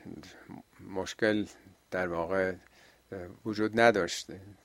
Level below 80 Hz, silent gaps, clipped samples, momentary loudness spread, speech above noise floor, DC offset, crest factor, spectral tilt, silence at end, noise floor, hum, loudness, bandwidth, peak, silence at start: -64 dBFS; none; under 0.1%; 23 LU; 20 dB; under 0.1%; 26 dB; -4.5 dB/octave; 0.1 s; -50 dBFS; none; -31 LUFS; 16 kHz; -6 dBFS; 0.05 s